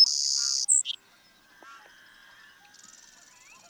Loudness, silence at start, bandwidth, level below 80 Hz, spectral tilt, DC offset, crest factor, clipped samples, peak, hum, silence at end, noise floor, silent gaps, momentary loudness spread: -23 LUFS; 0 s; over 20 kHz; -80 dBFS; 5 dB/octave; under 0.1%; 22 dB; under 0.1%; -8 dBFS; none; 1.95 s; -60 dBFS; none; 14 LU